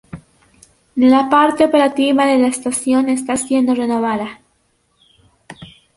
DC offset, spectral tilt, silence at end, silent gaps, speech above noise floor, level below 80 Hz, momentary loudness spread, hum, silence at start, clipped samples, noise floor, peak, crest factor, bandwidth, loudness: under 0.1%; -4 dB/octave; 0.3 s; none; 48 dB; -54 dBFS; 8 LU; none; 0.15 s; under 0.1%; -62 dBFS; -2 dBFS; 14 dB; 11.5 kHz; -15 LUFS